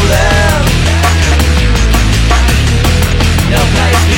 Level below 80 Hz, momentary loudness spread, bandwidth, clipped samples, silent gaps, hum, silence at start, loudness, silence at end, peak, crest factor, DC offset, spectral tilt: -12 dBFS; 1 LU; 17.5 kHz; under 0.1%; none; none; 0 s; -10 LUFS; 0 s; 0 dBFS; 8 dB; under 0.1%; -4.5 dB/octave